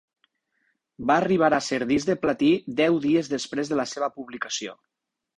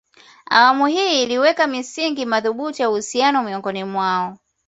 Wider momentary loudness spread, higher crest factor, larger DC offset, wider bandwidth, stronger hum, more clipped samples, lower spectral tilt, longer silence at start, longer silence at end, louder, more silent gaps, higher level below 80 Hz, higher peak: about the same, 10 LU vs 10 LU; about the same, 18 dB vs 18 dB; neither; first, 10.5 kHz vs 8.2 kHz; neither; neither; first, -5 dB/octave vs -3 dB/octave; first, 1 s vs 0.5 s; first, 0.65 s vs 0.3 s; second, -24 LUFS vs -18 LUFS; neither; about the same, -62 dBFS vs -66 dBFS; second, -6 dBFS vs 0 dBFS